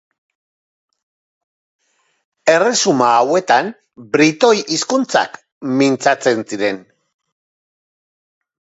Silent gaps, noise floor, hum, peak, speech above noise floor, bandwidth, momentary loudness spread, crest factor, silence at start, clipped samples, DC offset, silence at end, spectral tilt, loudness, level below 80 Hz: 5.52-5.61 s; under -90 dBFS; none; 0 dBFS; over 75 dB; 8.2 kHz; 9 LU; 18 dB; 2.45 s; under 0.1%; under 0.1%; 1.95 s; -3.5 dB/octave; -15 LUFS; -68 dBFS